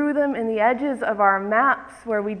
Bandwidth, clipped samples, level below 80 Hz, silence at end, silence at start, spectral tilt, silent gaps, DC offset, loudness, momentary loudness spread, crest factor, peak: 10.5 kHz; under 0.1%; -60 dBFS; 0 s; 0 s; -6.5 dB/octave; none; under 0.1%; -21 LUFS; 7 LU; 18 dB; -4 dBFS